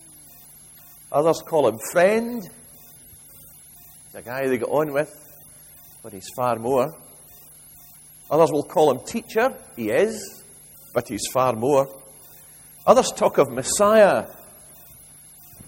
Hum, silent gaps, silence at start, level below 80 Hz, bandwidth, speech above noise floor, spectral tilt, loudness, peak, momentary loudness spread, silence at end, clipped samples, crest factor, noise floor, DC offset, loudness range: none; none; 1.1 s; -58 dBFS; 16.5 kHz; 26 dB; -4.5 dB/octave; -21 LUFS; 0 dBFS; 26 LU; 0.05 s; under 0.1%; 22 dB; -47 dBFS; under 0.1%; 9 LU